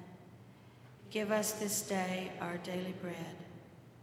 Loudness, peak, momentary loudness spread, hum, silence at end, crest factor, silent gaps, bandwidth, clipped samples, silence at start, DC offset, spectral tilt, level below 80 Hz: -37 LUFS; -18 dBFS; 23 LU; none; 0 s; 22 dB; none; 17.5 kHz; under 0.1%; 0 s; under 0.1%; -3.5 dB/octave; -76 dBFS